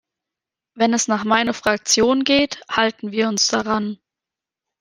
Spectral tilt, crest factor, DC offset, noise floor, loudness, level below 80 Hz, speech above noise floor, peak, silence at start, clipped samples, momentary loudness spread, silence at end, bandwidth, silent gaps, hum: -2.5 dB/octave; 18 dB; under 0.1%; -87 dBFS; -18 LUFS; -56 dBFS; 68 dB; -2 dBFS; 0.75 s; under 0.1%; 7 LU; 0.85 s; 14 kHz; none; none